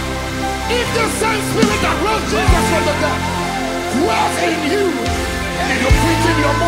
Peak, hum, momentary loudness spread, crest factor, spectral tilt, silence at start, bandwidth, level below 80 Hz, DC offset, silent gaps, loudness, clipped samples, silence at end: 0 dBFS; none; 6 LU; 16 dB; -4.5 dB/octave; 0 s; 16 kHz; -26 dBFS; under 0.1%; none; -16 LUFS; under 0.1%; 0 s